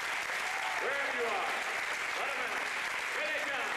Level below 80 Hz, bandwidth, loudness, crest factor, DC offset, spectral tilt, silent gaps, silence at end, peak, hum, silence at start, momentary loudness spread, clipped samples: -72 dBFS; 15 kHz; -33 LUFS; 12 dB; under 0.1%; -0.5 dB/octave; none; 0 s; -22 dBFS; none; 0 s; 2 LU; under 0.1%